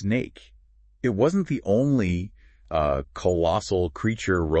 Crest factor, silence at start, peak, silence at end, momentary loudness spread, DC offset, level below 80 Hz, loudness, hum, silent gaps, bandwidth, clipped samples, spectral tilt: 16 dB; 0 s; -10 dBFS; 0 s; 8 LU; under 0.1%; -44 dBFS; -25 LUFS; none; none; 8.6 kHz; under 0.1%; -7 dB/octave